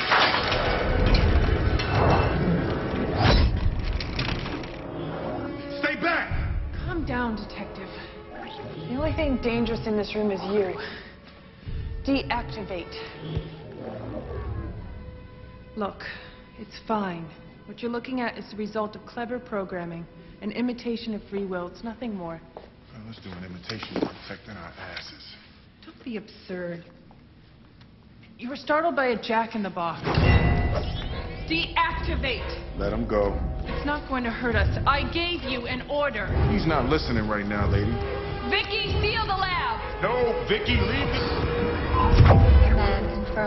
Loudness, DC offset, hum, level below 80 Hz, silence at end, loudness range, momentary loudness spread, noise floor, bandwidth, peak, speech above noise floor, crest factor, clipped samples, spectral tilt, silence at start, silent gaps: -26 LUFS; under 0.1%; none; -32 dBFS; 0 s; 13 LU; 18 LU; -52 dBFS; 6 kHz; -4 dBFS; 26 dB; 22 dB; under 0.1%; -7.5 dB/octave; 0 s; none